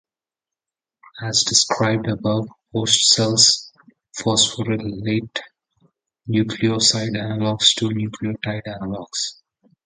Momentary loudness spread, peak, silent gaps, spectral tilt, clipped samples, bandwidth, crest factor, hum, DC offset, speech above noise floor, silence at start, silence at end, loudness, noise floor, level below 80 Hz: 14 LU; 0 dBFS; none; -3 dB/octave; under 0.1%; 9.6 kHz; 22 dB; none; under 0.1%; 69 dB; 1.15 s; 0.55 s; -18 LUFS; -89 dBFS; -54 dBFS